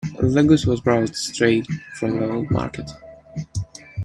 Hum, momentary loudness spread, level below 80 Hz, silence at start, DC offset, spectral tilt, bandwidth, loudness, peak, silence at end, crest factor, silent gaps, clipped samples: none; 18 LU; -44 dBFS; 0 s; under 0.1%; -6 dB/octave; 12.5 kHz; -21 LUFS; -2 dBFS; 0 s; 20 dB; none; under 0.1%